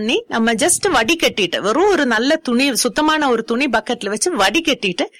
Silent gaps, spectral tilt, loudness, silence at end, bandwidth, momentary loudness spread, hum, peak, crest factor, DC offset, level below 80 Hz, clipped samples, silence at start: none; -2.5 dB/octave; -16 LUFS; 0.1 s; 16.5 kHz; 4 LU; none; -2 dBFS; 14 dB; under 0.1%; -48 dBFS; under 0.1%; 0 s